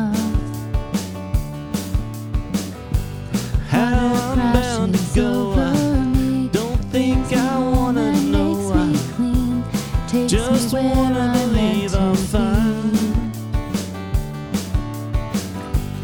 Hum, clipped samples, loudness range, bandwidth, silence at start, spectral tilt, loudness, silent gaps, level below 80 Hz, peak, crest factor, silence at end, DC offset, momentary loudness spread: none; under 0.1%; 5 LU; over 20 kHz; 0 s; -6 dB/octave; -20 LUFS; none; -26 dBFS; -2 dBFS; 18 dB; 0 s; under 0.1%; 8 LU